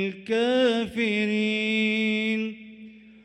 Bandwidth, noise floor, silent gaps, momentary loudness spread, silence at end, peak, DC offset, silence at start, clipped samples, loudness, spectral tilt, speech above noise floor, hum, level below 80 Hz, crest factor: 10.5 kHz; -47 dBFS; none; 9 LU; 0.15 s; -10 dBFS; under 0.1%; 0 s; under 0.1%; -24 LUFS; -5.5 dB/octave; 22 dB; none; -64 dBFS; 14 dB